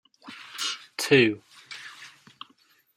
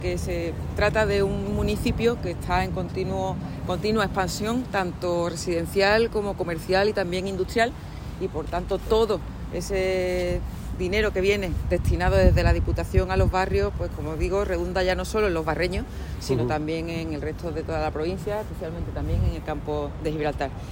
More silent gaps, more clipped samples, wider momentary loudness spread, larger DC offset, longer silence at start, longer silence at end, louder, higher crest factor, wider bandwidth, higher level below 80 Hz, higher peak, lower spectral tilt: neither; neither; first, 27 LU vs 9 LU; neither; first, 0.25 s vs 0 s; first, 0.9 s vs 0 s; about the same, -24 LUFS vs -25 LUFS; about the same, 22 dB vs 20 dB; about the same, 16 kHz vs 17 kHz; second, -72 dBFS vs -32 dBFS; about the same, -6 dBFS vs -4 dBFS; second, -4 dB/octave vs -6 dB/octave